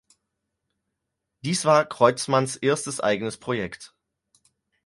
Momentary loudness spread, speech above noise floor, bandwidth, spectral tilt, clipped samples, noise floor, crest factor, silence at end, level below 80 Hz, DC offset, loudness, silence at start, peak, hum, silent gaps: 12 LU; 59 dB; 11.5 kHz; -4.5 dB/octave; under 0.1%; -82 dBFS; 22 dB; 1 s; -64 dBFS; under 0.1%; -23 LUFS; 1.45 s; -2 dBFS; none; none